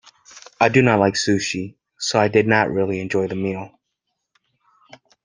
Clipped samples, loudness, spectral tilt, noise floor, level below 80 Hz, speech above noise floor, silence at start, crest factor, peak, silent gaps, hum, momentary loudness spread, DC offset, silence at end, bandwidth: under 0.1%; -19 LUFS; -5 dB/octave; -77 dBFS; -58 dBFS; 59 dB; 0.35 s; 20 dB; -2 dBFS; none; none; 13 LU; under 0.1%; 1.55 s; 10 kHz